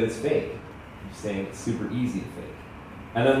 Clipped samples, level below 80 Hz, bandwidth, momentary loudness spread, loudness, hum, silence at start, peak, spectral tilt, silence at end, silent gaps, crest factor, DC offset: under 0.1%; -50 dBFS; 15 kHz; 17 LU; -29 LUFS; none; 0 s; -8 dBFS; -6 dB/octave; 0 s; none; 20 dB; under 0.1%